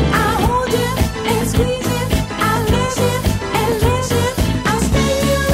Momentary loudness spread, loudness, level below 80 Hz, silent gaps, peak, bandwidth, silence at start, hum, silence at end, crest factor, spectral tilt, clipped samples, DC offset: 3 LU; -17 LUFS; -24 dBFS; none; -2 dBFS; 16.5 kHz; 0 s; none; 0 s; 14 dB; -5 dB/octave; under 0.1%; under 0.1%